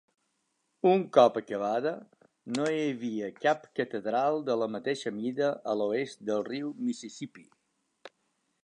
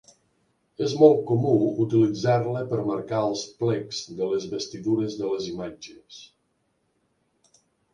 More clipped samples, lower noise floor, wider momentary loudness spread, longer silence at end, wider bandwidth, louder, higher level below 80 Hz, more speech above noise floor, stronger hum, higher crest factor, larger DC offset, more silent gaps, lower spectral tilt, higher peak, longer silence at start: neither; first, -77 dBFS vs -72 dBFS; second, 12 LU vs 18 LU; second, 0.55 s vs 1.7 s; about the same, 10.5 kHz vs 9.6 kHz; second, -30 LUFS vs -24 LUFS; second, -82 dBFS vs -64 dBFS; about the same, 48 dB vs 48 dB; neither; about the same, 24 dB vs 22 dB; neither; neither; about the same, -5.5 dB/octave vs -6.5 dB/octave; about the same, -6 dBFS vs -4 dBFS; about the same, 0.85 s vs 0.8 s